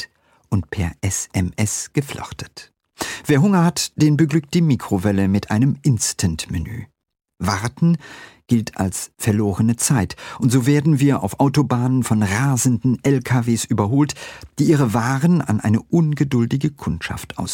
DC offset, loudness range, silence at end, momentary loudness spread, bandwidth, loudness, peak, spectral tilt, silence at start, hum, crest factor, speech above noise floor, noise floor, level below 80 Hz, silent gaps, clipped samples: under 0.1%; 4 LU; 0 s; 11 LU; 17 kHz; -19 LUFS; -4 dBFS; -5.5 dB/octave; 0 s; none; 14 dB; 23 dB; -41 dBFS; -44 dBFS; none; under 0.1%